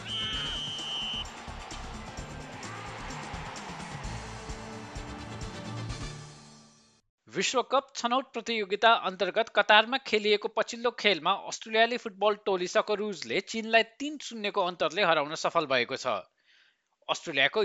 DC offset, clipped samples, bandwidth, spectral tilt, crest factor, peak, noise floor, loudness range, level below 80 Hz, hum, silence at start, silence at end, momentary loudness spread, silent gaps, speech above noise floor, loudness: under 0.1%; under 0.1%; 10.5 kHz; -3 dB/octave; 24 dB; -6 dBFS; -67 dBFS; 14 LU; -52 dBFS; none; 0 s; 0 s; 16 LU; 7.09-7.18 s; 39 dB; -28 LUFS